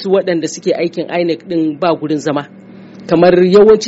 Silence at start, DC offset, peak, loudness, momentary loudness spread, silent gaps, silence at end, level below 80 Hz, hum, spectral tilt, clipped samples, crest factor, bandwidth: 0 s; under 0.1%; 0 dBFS; -13 LUFS; 11 LU; none; 0 s; -50 dBFS; none; -5.5 dB/octave; under 0.1%; 12 dB; 8 kHz